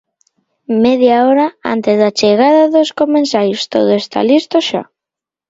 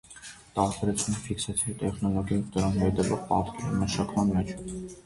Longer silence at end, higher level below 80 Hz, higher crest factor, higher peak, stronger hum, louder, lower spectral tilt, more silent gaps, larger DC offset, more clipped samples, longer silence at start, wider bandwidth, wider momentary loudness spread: first, 0.65 s vs 0.05 s; second, -58 dBFS vs -46 dBFS; second, 12 dB vs 18 dB; first, 0 dBFS vs -10 dBFS; neither; first, -12 LUFS vs -29 LUFS; about the same, -5 dB/octave vs -5.5 dB/octave; neither; neither; neither; first, 0.7 s vs 0.1 s; second, 7.8 kHz vs 11.5 kHz; second, 6 LU vs 9 LU